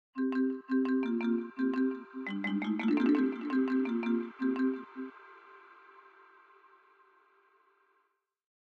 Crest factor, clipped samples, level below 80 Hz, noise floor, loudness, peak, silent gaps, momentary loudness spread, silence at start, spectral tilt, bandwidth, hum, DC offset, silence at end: 16 dB; under 0.1%; -82 dBFS; -78 dBFS; -32 LUFS; -18 dBFS; none; 12 LU; 0.15 s; -8 dB/octave; 5 kHz; none; under 0.1%; 3.15 s